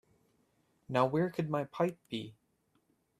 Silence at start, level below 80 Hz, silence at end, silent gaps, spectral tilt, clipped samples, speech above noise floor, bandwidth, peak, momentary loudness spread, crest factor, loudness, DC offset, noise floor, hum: 0.9 s; -76 dBFS; 0.9 s; none; -7.5 dB/octave; under 0.1%; 42 dB; 14.5 kHz; -14 dBFS; 12 LU; 22 dB; -34 LUFS; under 0.1%; -76 dBFS; none